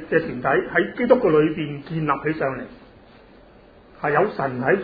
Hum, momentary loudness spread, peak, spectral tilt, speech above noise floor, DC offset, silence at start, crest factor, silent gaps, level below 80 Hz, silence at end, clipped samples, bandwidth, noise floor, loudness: none; 11 LU; -2 dBFS; -10 dB/octave; 28 dB; under 0.1%; 0 s; 20 dB; none; -52 dBFS; 0 s; under 0.1%; 5 kHz; -49 dBFS; -21 LUFS